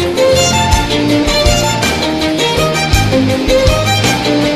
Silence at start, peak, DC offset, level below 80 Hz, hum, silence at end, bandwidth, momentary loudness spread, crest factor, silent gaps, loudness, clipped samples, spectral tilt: 0 s; 0 dBFS; under 0.1%; -22 dBFS; none; 0 s; 14 kHz; 3 LU; 12 dB; none; -11 LUFS; under 0.1%; -4 dB/octave